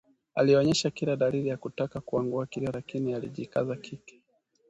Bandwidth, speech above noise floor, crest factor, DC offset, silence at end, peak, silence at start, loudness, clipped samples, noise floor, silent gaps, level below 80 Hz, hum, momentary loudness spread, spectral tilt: 8.8 kHz; 42 dB; 18 dB; under 0.1%; 0.6 s; -12 dBFS; 0.35 s; -29 LUFS; under 0.1%; -70 dBFS; none; -62 dBFS; none; 12 LU; -5.5 dB/octave